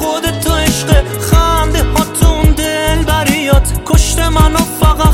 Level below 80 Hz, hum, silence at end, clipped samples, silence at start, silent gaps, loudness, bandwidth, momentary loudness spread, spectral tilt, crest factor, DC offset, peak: -14 dBFS; none; 0 s; under 0.1%; 0 s; none; -12 LUFS; 17 kHz; 3 LU; -4.5 dB/octave; 10 dB; under 0.1%; 0 dBFS